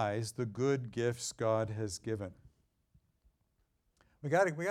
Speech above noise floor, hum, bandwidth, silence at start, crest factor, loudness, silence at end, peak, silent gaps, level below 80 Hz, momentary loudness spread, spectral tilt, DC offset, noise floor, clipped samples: 43 dB; none; 16 kHz; 0 s; 18 dB; -35 LUFS; 0 s; -18 dBFS; none; -68 dBFS; 10 LU; -5.5 dB/octave; under 0.1%; -77 dBFS; under 0.1%